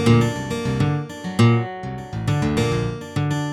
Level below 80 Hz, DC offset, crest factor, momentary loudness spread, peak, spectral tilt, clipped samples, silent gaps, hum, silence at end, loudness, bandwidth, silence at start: -42 dBFS; under 0.1%; 16 dB; 10 LU; -4 dBFS; -6.5 dB/octave; under 0.1%; none; none; 0 s; -22 LUFS; 12.5 kHz; 0 s